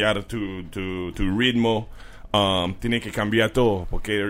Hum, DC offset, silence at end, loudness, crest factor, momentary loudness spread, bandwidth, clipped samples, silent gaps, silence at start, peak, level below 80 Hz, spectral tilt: none; under 0.1%; 0 s; -23 LUFS; 18 dB; 10 LU; 16 kHz; under 0.1%; none; 0 s; -6 dBFS; -36 dBFS; -5.5 dB/octave